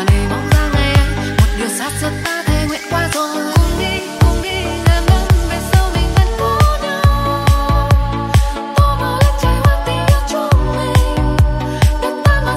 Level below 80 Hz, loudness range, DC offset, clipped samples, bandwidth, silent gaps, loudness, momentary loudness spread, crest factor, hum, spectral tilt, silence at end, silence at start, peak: -18 dBFS; 2 LU; under 0.1%; under 0.1%; 16 kHz; none; -15 LUFS; 5 LU; 12 dB; none; -5.5 dB/octave; 0 s; 0 s; 0 dBFS